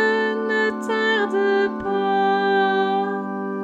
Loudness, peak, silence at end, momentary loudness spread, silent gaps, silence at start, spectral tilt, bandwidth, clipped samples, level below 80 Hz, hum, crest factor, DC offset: -21 LUFS; -8 dBFS; 0 s; 5 LU; none; 0 s; -5.5 dB/octave; 9 kHz; under 0.1%; -60 dBFS; none; 12 dB; under 0.1%